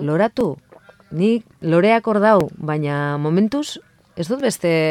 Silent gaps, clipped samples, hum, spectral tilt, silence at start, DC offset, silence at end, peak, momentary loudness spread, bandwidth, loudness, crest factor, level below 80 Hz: none; under 0.1%; none; -6.5 dB/octave; 0 s; under 0.1%; 0 s; -2 dBFS; 15 LU; 15.5 kHz; -19 LUFS; 16 dB; -56 dBFS